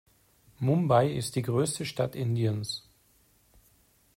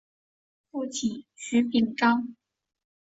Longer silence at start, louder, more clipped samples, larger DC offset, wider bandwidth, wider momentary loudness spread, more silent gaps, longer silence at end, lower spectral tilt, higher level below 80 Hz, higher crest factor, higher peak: second, 0.6 s vs 0.75 s; second, -29 LUFS vs -26 LUFS; neither; neither; first, 16 kHz vs 8 kHz; second, 10 LU vs 15 LU; neither; first, 1.35 s vs 0.75 s; first, -6 dB/octave vs -4 dB/octave; first, -64 dBFS vs -70 dBFS; about the same, 20 dB vs 20 dB; about the same, -10 dBFS vs -8 dBFS